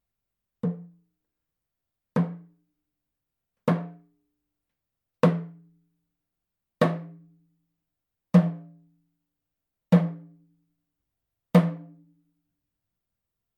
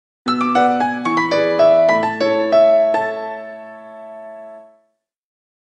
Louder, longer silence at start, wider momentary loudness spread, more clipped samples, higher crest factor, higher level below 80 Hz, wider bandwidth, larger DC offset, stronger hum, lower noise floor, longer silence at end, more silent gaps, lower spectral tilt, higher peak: second, -26 LUFS vs -15 LUFS; first, 0.65 s vs 0.25 s; about the same, 21 LU vs 23 LU; neither; first, 26 dB vs 14 dB; second, -78 dBFS vs -66 dBFS; second, 6.6 kHz vs 8.8 kHz; neither; neither; first, -86 dBFS vs -66 dBFS; first, 1.7 s vs 1.05 s; neither; first, -9 dB/octave vs -5.5 dB/octave; about the same, -4 dBFS vs -2 dBFS